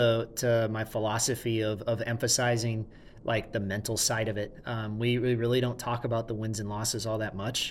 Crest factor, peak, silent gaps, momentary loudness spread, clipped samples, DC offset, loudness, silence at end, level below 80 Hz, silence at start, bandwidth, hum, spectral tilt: 18 dB; -12 dBFS; none; 7 LU; under 0.1%; under 0.1%; -30 LUFS; 0 s; -54 dBFS; 0 s; 16.5 kHz; none; -4 dB/octave